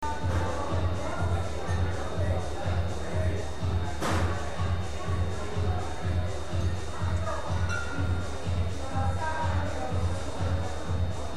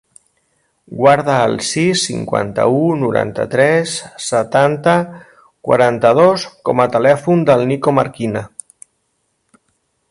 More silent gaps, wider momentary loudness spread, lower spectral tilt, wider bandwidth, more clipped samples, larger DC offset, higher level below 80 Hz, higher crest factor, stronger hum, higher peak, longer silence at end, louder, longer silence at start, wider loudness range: neither; second, 3 LU vs 10 LU; about the same, -6 dB/octave vs -5 dB/octave; about the same, 11.5 kHz vs 11.5 kHz; neither; first, 2% vs under 0.1%; first, -38 dBFS vs -54 dBFS; about the same, 14 dB vs 16 dB; neither; second, -16 dBFS vs 0 dBFS; second, 0 s vs 1.65 s; second, -31 LUFS vs -14 LUFS; second, 0 s vs 0.9 s; about the same, 1 LU vs 2 LU